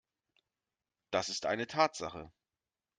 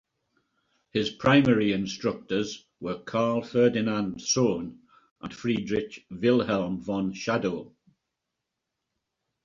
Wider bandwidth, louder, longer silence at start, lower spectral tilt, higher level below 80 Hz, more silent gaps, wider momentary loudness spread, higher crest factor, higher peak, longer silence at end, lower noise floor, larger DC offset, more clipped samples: first, 9.6 kHz vs 7.6 kHz; second, -34 LUFS vs -26 LUFS; first, 1.1 s vs 0.95 s; second, -3 dB/octave vs -5 dB/octave; second, -72 dBFS vs -60 dBFS; second, none vs 5.11-5.16 s; about the same, 12 LU vs 13 LU; about the same, 24 dB vs 20 dB; second, -14 dBFS vs -8 dBFS; second, 0.7 s vs 1.75 s; first, under -90 dBFS vs -84 dBFS; neither; neither